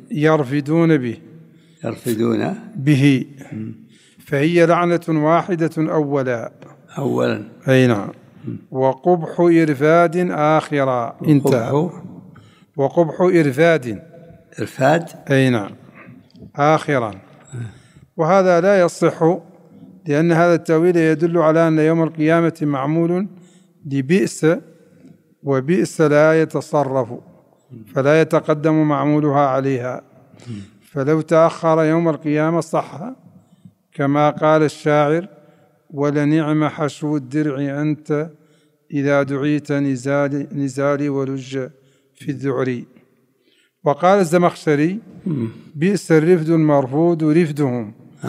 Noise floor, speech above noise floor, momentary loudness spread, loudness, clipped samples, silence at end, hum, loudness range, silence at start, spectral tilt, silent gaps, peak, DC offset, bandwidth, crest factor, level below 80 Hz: -60 dBFS; 43 dB; 16 LU; -17 LUFS; under 0.1%; 0 s; none; 5 LU; 0.1 s; -7 dB/octave; none; 0 dBFS; under 0.1%; 15 kHz; 16 dB; -68 dBFS